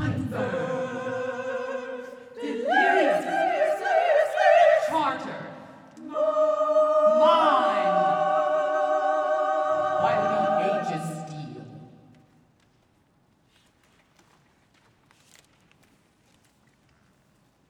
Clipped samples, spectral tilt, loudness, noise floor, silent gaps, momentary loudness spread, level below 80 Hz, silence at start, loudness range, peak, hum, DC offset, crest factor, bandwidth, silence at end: under 0.1%; -5.5 dB/octave; -23 LUFS; -64 dBFS; none; 18 LU; -66 dBFS; 0 s; 7 LU; -8 dBFS; none; under 0.1%; 18 dB; 11.5 kHz; 5.85 s